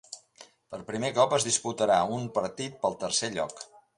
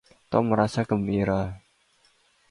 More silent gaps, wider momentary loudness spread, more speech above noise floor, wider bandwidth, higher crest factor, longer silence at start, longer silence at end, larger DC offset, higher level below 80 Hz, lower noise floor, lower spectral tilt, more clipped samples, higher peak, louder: neither; first, 19 LU vs 9 LU; second, 27 dB vs 40 dB; about the same, 11.5 kHz vs 11 kHz; about the same, 20 dB vs 20 dB; second, 0.1 s vs 0.3 s; second, 0.35 s vs 0.9 s; neither; second, -66 dBFS vs -50 dBFS; second, -56 dBFS vs -64 dBFS; second, -3 dB/octave vs -7.5 dB/octave; neither; second, -10 dBFS vs -6 dBFS; second, -28 LUFS vs -25 LUFS